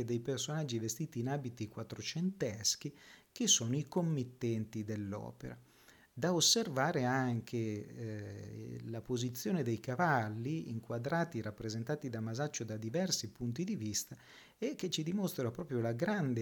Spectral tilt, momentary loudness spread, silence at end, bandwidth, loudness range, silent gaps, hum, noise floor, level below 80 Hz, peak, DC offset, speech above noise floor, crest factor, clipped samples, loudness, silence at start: -4 dB/octave; 14 LU; 0 s; 19 kHz; 4 LU; none; none; -64 dBFS; -70 dBFS; -16 dBFS; under 0.1%; 27 dB; 22 dB; under 0.1%; -36 LUFS; 0 s